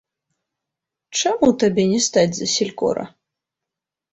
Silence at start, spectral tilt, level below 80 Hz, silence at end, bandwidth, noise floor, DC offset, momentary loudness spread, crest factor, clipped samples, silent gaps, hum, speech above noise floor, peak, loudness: 1.1 s; -4 dB/octave; -58 dBFS; 1.05 s; 8.4 kHz; -85 dBFS; under 0.1%; 9 LU; 18 dB; under 0.1%; none; none; 67 dB; -4 dBFS; -19 LUFS